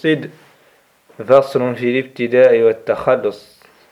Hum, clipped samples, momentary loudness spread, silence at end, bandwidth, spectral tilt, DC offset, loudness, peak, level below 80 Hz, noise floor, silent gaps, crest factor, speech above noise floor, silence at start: none; under 0.1%; 11 LU; 0.55 s; 12 kHz; -7 dB/octave; under 0.1%; -15 LUFS; 0 dBFS; -58 dBFS; -54 dBFS; none; 16 dB; 39 dB; 0.05 s